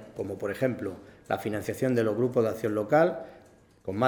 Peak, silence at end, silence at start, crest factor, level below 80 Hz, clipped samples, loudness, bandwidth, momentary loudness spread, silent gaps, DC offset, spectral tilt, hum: -10 dBFS; 0 s; 0 s; 18 dB; -64 dBFS; under 0.1%; -28 LUFS; over 20 kHz; 15 LU; none; under 0.1%; -7 dB/octave; none